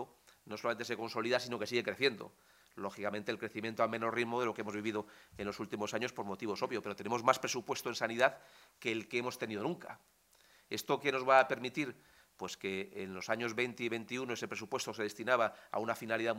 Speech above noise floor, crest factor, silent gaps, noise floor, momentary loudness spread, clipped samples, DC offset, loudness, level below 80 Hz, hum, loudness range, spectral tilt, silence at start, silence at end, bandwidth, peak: 30 dB; 26 dB; none; -67 dBFS; 11 LU; under 0.1%; under 0.1%; -36 LUFS; -78 dBFS; none; 3 LU; -4 dB/octave; 0 s; 0 s; 16 kHz; -12 dBFS